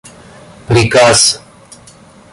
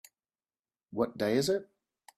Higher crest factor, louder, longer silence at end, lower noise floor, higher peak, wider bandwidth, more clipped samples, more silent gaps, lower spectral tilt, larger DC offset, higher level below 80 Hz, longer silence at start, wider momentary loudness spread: about the same, 14 dB vs 18 dB; first, -9 LUFS vs -31 LUFS; first, 0.95 s vs 0.55 s; second, -40 dBFS vs under -90 dBFS; first, 0 dBFS vs -16 dBFS; second, 11.5 kHz vs 15 kHz; neither; neither; second, -3 dB/octave vs -5 dB/octave; neither; first, -38 dBFS vs -70 dBFS; second, 0.7 s vs 0.9 s; about the same, 8 LU vs 7 LU